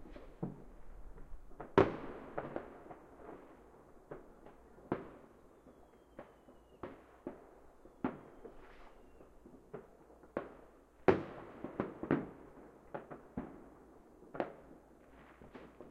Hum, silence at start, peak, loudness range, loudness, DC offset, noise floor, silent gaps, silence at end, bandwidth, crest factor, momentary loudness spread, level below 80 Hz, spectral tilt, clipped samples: none; 0 s; -10 dBFS; 11 LU; -40 LUFS; under 0.1%; -62 dBFS; none; 0 s; 9.6 kHz; 34 dB; 26 LU; -60 dBFS; -8 dB/octave; under 0.1%